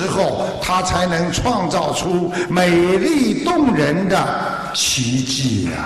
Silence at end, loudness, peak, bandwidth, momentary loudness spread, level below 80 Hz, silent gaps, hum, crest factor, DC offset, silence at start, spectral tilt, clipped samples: 0 s; -17 LUFS; -4 dBFS; 13 kHz; 5 LU; -40 dBFS; none; none; 14 dB; under 0.1%; 0 s; -4.5 dB/octave; under 0.1%